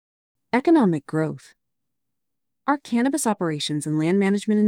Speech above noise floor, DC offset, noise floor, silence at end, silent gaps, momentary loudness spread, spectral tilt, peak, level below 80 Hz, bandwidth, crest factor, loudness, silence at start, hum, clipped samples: 64 dB; under 0.1%; -85 dBFS; 0 s; none; 8 LU; -5.5 dB/octave; -6 dBFS; -72 dBFS; 16.5 kHz; 16 dB; -22 LUFS; 0.55 s; none; under 0.1%